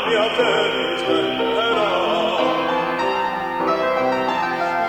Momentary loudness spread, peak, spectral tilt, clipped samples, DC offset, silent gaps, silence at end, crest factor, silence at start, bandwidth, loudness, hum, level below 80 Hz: 3 LU; -6 dBFS; -4 dB/octave; under 0.1%; under 0.1%; none; 0 s; 14 dB; 0 s; 17.5 kHz; -19 LUFS; none; -54 dBFS